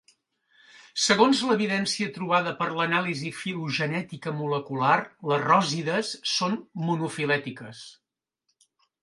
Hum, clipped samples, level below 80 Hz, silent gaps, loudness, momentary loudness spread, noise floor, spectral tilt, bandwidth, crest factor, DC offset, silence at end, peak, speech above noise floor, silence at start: none; under 0.1%; -72 dBFS; none; -25 LUFS; 11 LU; -78 dBFS; -4 dB/octave; 11.5 kHz; 22 dB; under 0.1%; 1.1 s; -4 dBFS; 52 dB; 0.95 s